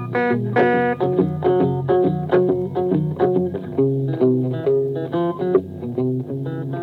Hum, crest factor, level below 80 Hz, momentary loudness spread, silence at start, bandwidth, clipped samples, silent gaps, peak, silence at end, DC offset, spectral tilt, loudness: 50 Hz at -45 dBFS; 16 dB; -58 dBFS; 6 LU; 0 s; 4.6 kHz; under 0.1%; none; -4 dBFS; 0 s; under 0.1%; -10 dB/octave; -20 LUFS